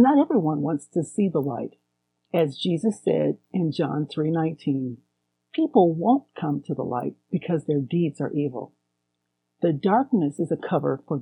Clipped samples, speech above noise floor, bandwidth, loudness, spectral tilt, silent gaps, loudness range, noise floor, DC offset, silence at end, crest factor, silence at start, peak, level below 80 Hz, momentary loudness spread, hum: under 0.1%; 55 dB; 11 kHz; -25 LUFS; -8 dB/octave; none; 2 LU; -78 dBFS; under 0.1%; 0 s; 18 dB; 0 s; -6 dBFS; -72 dBFS; 10 LU; 60 Hz at -55 dBFS